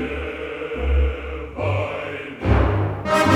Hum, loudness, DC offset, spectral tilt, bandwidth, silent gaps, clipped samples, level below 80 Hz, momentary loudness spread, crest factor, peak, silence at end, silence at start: none; -23 LUFS; under 0.1%; -6.5 dB/octave; 13.5 kHz; none; under 0.1%; -26 dBFS; 10 LU; 18 dB; -2 dBFS; 0 s; 0 s